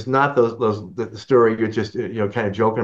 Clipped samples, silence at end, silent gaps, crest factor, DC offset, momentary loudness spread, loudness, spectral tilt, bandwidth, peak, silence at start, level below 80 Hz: under 0.1%; 0 s; none; 16 dB; under 0.1%; 10 LU; -20 LUFS; -7.5 dB/octave; 7.6 kHz; -4 dBFS; 0 s; -60 dBFS